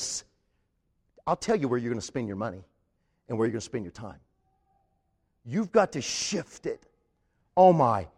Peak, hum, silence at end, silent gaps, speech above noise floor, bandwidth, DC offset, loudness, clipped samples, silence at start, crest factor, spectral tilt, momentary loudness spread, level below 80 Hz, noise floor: -6 dBFS; none; 0.1 s; none; 47 dB; 12 kHz; under 0.1%; -27 LUFS; under 0.1%; 0 s; 22 dB; -5 dB/octave; 17 LU; -62 dBFS; -74 dBFS